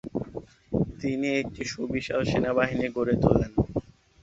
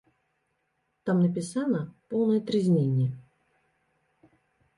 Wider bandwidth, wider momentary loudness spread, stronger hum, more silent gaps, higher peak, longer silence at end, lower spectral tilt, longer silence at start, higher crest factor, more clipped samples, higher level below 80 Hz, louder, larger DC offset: second, 8 kHz vs 11.5 kHz; first, 11 LU vs 8 LU; neither; neither; first, -4 dBFS vs -14 dBFS; second, 0.4 s vs 1.55 s; second, -6.5 dB/octave vs -8 dB/octave; second, 0.05 s vs 1.05 s; first, 24 dB vs 14 dB; neither; first, -44 dBFS vs -70 dBFS; about the same, -27 LUFS vs -27 LUFS; neither